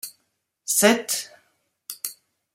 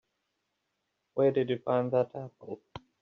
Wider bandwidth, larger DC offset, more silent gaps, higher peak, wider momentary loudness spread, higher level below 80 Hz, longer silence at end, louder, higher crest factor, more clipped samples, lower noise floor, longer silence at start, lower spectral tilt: first, 16.5 kHz vs 6.2 kHz; neither; neither; first, -2 dBFS vs -14 dBFS; first, 22 LU vs 17 LU; about the same, -74 dBFS vs -72 dBFS; first, 0.4 s vs 0.25 s; first, -22 LUFS vs -30 LUFS; first, 24 dB vs 18 dB; neither; second, -74 dBFS vs -81 dBFS; second, 0.05 s vs 1.15 s; second, -2 dB/octave vs -6.5 dB/octave